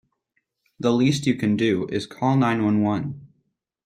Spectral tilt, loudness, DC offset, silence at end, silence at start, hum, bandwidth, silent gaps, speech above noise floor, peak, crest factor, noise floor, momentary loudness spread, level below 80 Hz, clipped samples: -6.5 dB/octave; -22 LUFS; under 0.1%; 0.6 s; 0.8 s; none; 13 kHz; none; 53 dB; -8 dBFS; 16 dB; -74 dBFS; 8 LU; -60 dBFS; under 0.1%